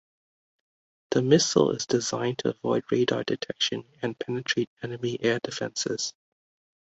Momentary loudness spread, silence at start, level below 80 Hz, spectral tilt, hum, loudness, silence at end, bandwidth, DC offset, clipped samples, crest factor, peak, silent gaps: 11 LU; 1.1 s; -66 dBFS; -4 dB/octave; none; -27 LUFS; 0.7 s; 8.2 kHz; under 0.1%; under 0.1%; 22 dB; -6 dBFS; 4.67-4.77 s